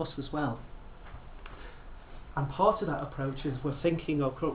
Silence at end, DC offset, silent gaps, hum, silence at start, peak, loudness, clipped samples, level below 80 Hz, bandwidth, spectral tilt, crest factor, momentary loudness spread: 0 s; under 0.1%; none; none; 0 s; -12 dBFS; -32 LUFS; under 0.1%; -48 dBFS; 4 kHz; -6.5 dB/octave; 20 dB; 24 LU